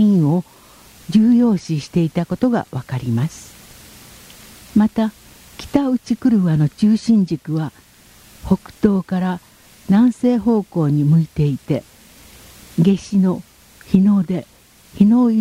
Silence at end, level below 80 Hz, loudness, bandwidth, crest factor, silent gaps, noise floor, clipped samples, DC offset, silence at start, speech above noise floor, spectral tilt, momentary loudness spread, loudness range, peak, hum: 0 s; -48 dBFS; -17 LUFS; 15.5 kHz; 16 dB; none; -46 dBFS; under 0.1%; under 0.1%; 0 s; 30 dB; -8 dB/octave; 10 LU; 4 LU; 0 dBFS; none